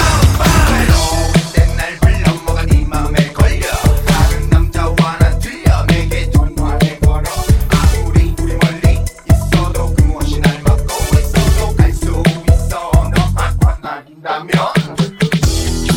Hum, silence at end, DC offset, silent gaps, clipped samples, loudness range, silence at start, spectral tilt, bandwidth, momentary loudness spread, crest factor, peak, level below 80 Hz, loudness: none; 0 s; under 0.1%; none; 0.3%; 2 LU; 0 s; -5.5 dB/octave; 17.5 kHz; 4 LU; 12 dB; 0 dBFS; -16 dBFS; -14 LUFS